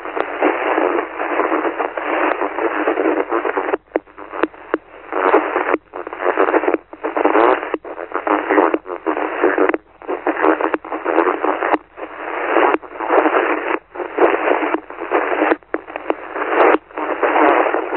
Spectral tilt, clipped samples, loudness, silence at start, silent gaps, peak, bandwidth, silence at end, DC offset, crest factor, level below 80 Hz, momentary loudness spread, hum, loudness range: -8 dB/octave; under 0.1%; -18 LUFS; 0 s; none; 0 dBFS; 4.2 kHz; 0 s; under 0.1%; 18 dB; -58 dBFS; 11 LU; none; 2 LU